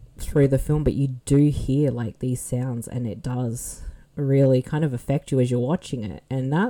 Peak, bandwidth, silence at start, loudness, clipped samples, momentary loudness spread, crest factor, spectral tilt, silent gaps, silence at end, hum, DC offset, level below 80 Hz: -8 dBFS; 17 kHz; 0 s; -23 LUFS; under 0.1%; 10 LU; 14 dB; -7.5 dB/octave; none; 0 s; none; under 0.1%; -38 dBFS